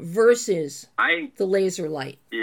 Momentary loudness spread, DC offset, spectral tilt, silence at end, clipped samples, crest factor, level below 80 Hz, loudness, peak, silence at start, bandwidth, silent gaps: 11 LU; under 0.1%; -4 dB/octave; 0 s; under 0.1%; 16 dB; -78 dBFS; -23 LUFS; -6 dBFS; 0 s; 17.5 kHz; none